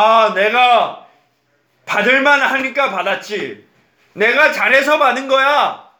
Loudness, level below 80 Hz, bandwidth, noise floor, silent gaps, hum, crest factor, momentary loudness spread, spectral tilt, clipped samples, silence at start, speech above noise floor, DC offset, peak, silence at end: -13 LUFS; -68 dBFS; over 20 kHz; -61 dBFS; none; none; 14 dB; 10 LU; -3 dB/octave; under 0.1%; 0 s; 48 dB; under 0.1%; 0 dBFS; 0.2 s